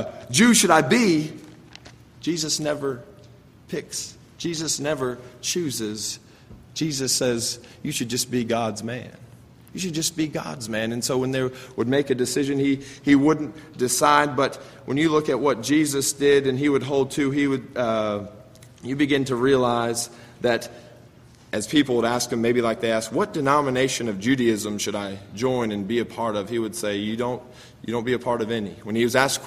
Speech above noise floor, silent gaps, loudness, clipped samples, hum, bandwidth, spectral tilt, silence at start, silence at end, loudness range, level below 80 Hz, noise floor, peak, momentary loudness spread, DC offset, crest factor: 27 dB; none; -23 LUFS; under 0.1%; none; 15.5 kHz; -4 dB/octave; 0 s; 0 s; 7 LU; -58 dBFS; -49 dBFS; -2 dBFS; 13 LU; under 0.1%; 20 dB